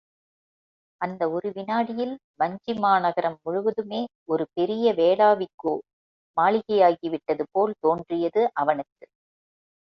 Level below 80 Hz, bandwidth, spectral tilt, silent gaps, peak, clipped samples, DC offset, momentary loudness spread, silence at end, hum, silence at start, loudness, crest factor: -70 dBFS; 6 kHz; -8 dB/octave; 2.24-2.34 s, 4.15-4.26 s, 5.54-5.58 s, 5.93-6.34 s; -6 dBFS; under 0.1%; under 0.1%; 11 LU; 1.05 s; none; 1 s; -24 LUFS; 18 dB